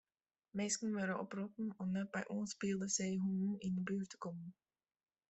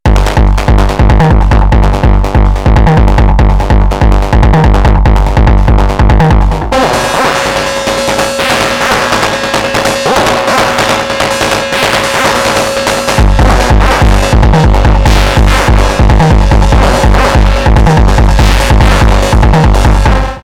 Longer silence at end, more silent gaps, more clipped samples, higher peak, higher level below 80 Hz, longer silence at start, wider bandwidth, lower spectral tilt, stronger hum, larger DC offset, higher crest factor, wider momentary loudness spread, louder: first, 0.75 s vs 0.05 s; neither; neither; second, -24 dBFS vs 0 dBFS; second, -78 dBFS vs -8 dBFS; first, 0.55 s vs 0.05 s; second, 8.2 kHz vs 15 kHz; about the same, -4.5 dB/octave vs -5.5 dB/octave; neither; neither; first, 18 dB vs 6 dB; first, 10 LU vs 3 LU; second, -41 LUFS vs -8 LUFS